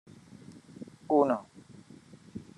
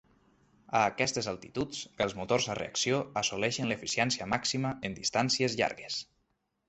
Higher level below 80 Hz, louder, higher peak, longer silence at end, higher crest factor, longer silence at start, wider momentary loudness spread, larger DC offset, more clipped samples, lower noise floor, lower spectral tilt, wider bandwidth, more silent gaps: second, -76 dBFS vs -62 dBFS; first, -28 LUFS vs -31 LUFS; about the same, -12 dBFS vs -12 dBFS; second, 0.2 s vs 0.65 s; about the same, 22 dB vs 22 dB; second, 0.5 s vs 0.7 s; first, 27 LU vs 8 LU; neither; neither; second, -54 dBFS vs -78 dBFS; first, -7.5 dB/octave vs -3.5 dB/octave; first, 11 kHz vs 8.6 kHz; neither